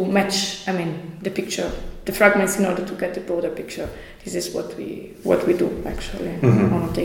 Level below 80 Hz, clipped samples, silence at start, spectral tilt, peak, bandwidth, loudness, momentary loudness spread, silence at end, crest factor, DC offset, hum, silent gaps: -40 dBFS; under 0.1%; 0 s; -5 dB/octave; -2 dBFS; 17 kHz; -22 LUFS; 14 LU; 0 s; 20 dB; under 0.1%; none; none